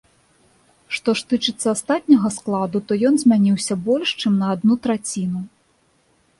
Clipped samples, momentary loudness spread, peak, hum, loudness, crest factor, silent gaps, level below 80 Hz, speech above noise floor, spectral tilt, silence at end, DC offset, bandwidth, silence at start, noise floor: under 0.1%; 9 LU; -2 dBFS; none; -19 LUFS; 18 dB; none; -60 dBFS; 43 dB; -5 dB/octave; 0.9 s; under 0.1%; 11.5 kHz; 0.9 s; -61 dBFS